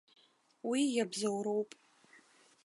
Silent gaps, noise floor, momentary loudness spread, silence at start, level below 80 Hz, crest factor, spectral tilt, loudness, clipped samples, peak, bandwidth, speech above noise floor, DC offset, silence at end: none; -65 dBFS; 10 LU; 0.65 s; under -90 dBFS; 16 dB; -4 dB/octave; -35 LUFS; under 0.1%; -20 dBFS; 11.5 kHz; 31 dB; under 0.1%; 1 s